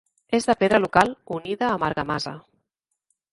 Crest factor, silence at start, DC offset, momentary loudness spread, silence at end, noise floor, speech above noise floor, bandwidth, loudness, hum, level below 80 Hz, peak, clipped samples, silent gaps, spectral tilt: 22 dB; 0.3 s; under 0.1%; 13 LU; 0.95 s; -79 dBFS; 57 dB; 11.5 kHz; -23 LUFS; none; -54 dBFS; -2 dBFS; under 0.1%; none; -5 dB/octave